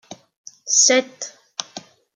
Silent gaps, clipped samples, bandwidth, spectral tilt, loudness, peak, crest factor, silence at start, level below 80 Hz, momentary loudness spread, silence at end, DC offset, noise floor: 0.36-0.44 s; under 0.1%; 11 kHz; 0.5 dB/octave; -15 LUFS; 0 dBFS; 22 dB; 0.1 s; -82 dBFS; 24 LU; 0.35 s; under 0.1%; -41 dBFS